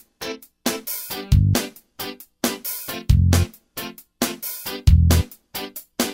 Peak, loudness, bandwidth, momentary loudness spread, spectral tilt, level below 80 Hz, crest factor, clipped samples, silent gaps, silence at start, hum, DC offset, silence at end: -2 dBFS; -22 LUFS; 16.5 kHz; 16 LU; -5 dB/octave; -26 dBFS; 20 dB; under 0.1%; none; 0.2 s; none; under 0.1%; 0 s